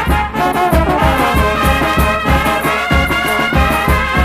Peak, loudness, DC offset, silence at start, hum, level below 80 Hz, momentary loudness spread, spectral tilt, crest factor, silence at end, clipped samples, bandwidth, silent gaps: 0 dBFS; -13 LUFS; under 0.1%; 0 s; none; -20 dBFS; 2 LU; -5.5 dB/octave; 12 dB; 0 s; under 0.1%; 15.5 kHz; none